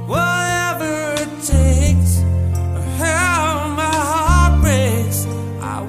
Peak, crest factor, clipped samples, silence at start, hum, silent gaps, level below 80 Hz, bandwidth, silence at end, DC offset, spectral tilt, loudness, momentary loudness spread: -2 dBFS; 12 dB; under 0.1%; 0 s; none; none; -22 dBFS; 16 kHz; 0 s; under 0.1%; -5 dB/octave; -17 LUFS; 8 LU